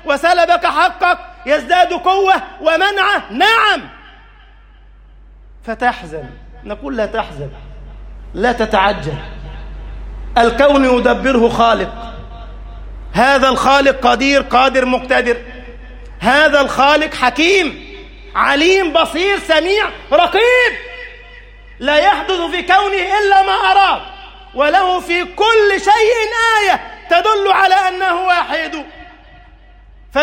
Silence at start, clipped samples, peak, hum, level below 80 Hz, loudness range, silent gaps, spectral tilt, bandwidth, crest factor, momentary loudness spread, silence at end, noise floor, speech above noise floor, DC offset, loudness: 0.05 s; under 0.1%; 0 dBFS; none; -34 dBFS; 7 LU; none; -3.5 dB/octave; 16.5 kHz; 14 dB; 20 LU; 0 s; -42 dBFS; 29 dB; under 0.1%; -13 LUFS